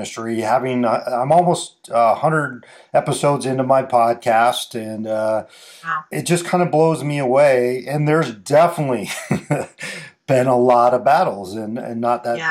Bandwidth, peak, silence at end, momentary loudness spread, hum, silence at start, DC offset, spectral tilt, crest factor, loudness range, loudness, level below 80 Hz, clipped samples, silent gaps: 16 kHz; -4 dBFS; 0 s; 12 LU; none; 0 s; under 0.1%; -5.5 dB/octave; 14 dB; 2 LU; -18 LUFS; -66 dBFS; under 0.1%; none